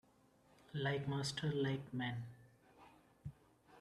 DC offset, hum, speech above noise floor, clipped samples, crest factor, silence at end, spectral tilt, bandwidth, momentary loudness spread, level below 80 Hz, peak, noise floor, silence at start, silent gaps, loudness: under 0.1%; none; 30 dB; under 0.1%; 18 dB; 0 s; -5.5 dB/octave; 12.5 kHz; 16 LU; -72 dBFS; -26 dBFS; -71 dBFS; 0.7 s; none; -41 LUFS